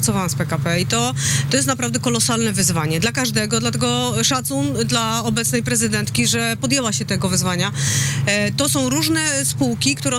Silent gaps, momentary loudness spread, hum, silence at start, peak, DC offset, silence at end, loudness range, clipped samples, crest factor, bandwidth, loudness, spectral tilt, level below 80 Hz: none; 3 LU; none; 0 s; -8 dBFS; under 0.1%; 0 s; 0 LU; under 0.1%; 12 dB; 16 kHz; -18 LUFS; -3.5 dB/octave; -46 dBFS